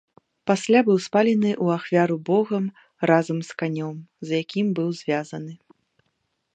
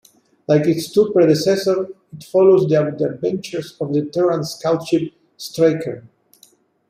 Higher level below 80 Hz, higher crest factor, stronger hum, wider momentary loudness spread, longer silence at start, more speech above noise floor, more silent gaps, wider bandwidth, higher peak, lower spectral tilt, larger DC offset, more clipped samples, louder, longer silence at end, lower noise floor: second, -74 dBFS vs -62 dBFS; about the same, 20 dB vs 16 dB; neither; second, 13 LU vs 16 LU; about the same, 0.45 s vs 0.5 s; first, 52 dB vs 37 dB; neither; second, 9 kHz vs 15.5 kHz; about the same, -4 dBFS vs -2 dBFS; about the same, -6.5 dB/octave vs -6.5 dB/octave; neither; neither; second, -23 LUFS vs -18 LUFS; about the same, 1 s vs 0.9 s; first, -74 dBFS vs -54 dBFS